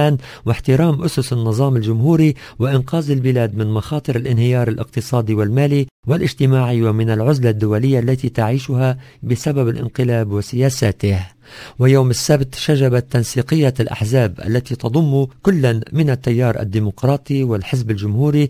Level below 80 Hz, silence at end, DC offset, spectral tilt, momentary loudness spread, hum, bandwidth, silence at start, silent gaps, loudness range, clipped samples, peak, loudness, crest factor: -40 dBFS; 0 s; under 0.1%; -7 dB/octave; 6 LU; none; 16 kHz; 0 s; 5.91-6.03 s; 2 LU; under 0.1%; 0 dBFS; -17 LUFS; 16 dB